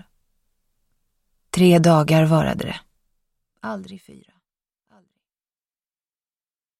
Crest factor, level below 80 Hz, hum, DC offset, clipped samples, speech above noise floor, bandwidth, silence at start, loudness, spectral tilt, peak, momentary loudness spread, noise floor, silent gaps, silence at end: 20 dB; -54 dBFS; none; under 0.1%; under 0.1%; over 73 dB; 14 kHz; 1.55 s; -17 LUFS; -6.5 dB/octave; -4 dBFS; 20 LU; under -90 dBFS; none; 2.8 s